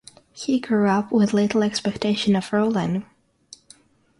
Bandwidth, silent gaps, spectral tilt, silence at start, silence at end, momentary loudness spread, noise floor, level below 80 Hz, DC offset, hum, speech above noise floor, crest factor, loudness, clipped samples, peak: 11 kHz; none; -6 dB/octave; 0.35 s; 1.15 s; 6 LU; -54 dBFS; -58 dBFS; under 0.1%; none; 33 dB; 14 dB; -22 LUFS; under 0.1%; -8 dBFS